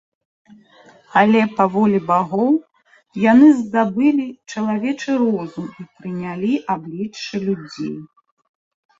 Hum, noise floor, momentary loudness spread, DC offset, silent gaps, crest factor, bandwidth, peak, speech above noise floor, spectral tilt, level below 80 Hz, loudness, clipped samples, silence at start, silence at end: none; -49 dBFS; 16 LU; under 0.1%; none; 18 dB; 7.6 kHz; -2 dBFS; 32 dB; -7 dB/octave; -62 dBFS; -18 LUFS; under 0.1%; 1.15 s; 0.95 s